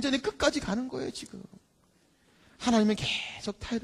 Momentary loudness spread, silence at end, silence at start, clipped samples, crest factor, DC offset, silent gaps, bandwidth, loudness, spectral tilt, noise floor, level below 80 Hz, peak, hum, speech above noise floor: 14 LU; 0 s; 0 s; under 0.1%; 22 dB; under 0.1%; none; 12.5 kHz; -30 LUFS; -4 dB/octave; -66 dBFS; -54 dBFS; -10 dBFS; none; 37 dB